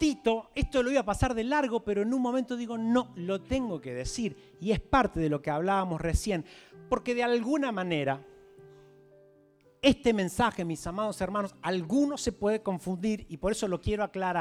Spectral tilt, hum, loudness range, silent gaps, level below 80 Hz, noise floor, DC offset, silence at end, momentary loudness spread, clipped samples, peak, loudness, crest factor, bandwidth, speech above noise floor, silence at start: -5.5 dB/octave; none; 2 LU; none; -46 dBFS; -62 dBFS; under 0.1%; 0 s; 7 LU; under 0.1%; -10 dBFS; -30 LUFS; 20 dB; 15 kHz; 33 dB; 0 s